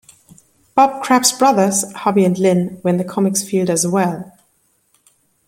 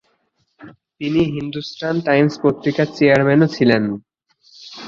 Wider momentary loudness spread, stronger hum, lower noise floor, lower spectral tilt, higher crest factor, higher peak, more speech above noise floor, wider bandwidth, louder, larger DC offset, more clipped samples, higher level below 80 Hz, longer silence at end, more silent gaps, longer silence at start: second, 6 LU vs 13 LU; neither; second, -61 dBFS vs -66 dBFS; second, -4.5 dB/octave vs -7 dB/octave; about the same, 16 dB vs 18 dB; about the same, 0 dBFS vs 0 dBFS; about the same, 46 dB vs 49 dB; first, 16.5 kHz vs 7.4 kHz; about the same, -16 LUFS vs -17 LUFS; neither; neither; second, -62 dBFS vs -54 dBFS; first, 1.2 s vs 0 s; neither; first, 0.75 s vs 0.6 s